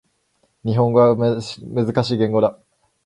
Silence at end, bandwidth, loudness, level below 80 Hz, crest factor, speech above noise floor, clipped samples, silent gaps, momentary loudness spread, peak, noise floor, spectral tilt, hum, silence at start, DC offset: 0.55 s; 11 kHz; -19 LUFS; -54 dBFS; 18 dB; 48 dB; under 0.1%; none; 11 LU; -2 dBFS; -65 dBFS; -7.5 dB/octave; none; 0.65 s; under 0.1%